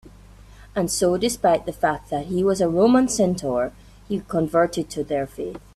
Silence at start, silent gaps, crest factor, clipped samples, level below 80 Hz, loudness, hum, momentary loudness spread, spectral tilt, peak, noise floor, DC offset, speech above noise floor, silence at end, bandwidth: 0.05 s; none; 16 dB; under 0.1%; -48 dBFS; -22 LUFS; none; 12 LU; -5 dB/octave; -6 dBFS; -46 dBFS; under 0.1%; 24 dB; 0.2 s; 14.5 kHz